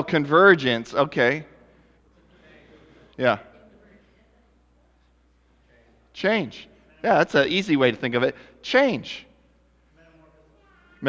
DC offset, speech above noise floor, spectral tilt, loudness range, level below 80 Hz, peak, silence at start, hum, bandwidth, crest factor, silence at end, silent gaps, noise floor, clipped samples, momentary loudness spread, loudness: under 0.1%; 40 dB; -6 dB/octave; 10 LU; -60 dBFS; -2 dBFS; 0 s; none; 8 kHz; 22 dB; 0 s; none; -61 dBFS; under 0.1%; 19 LU; -21 LUFS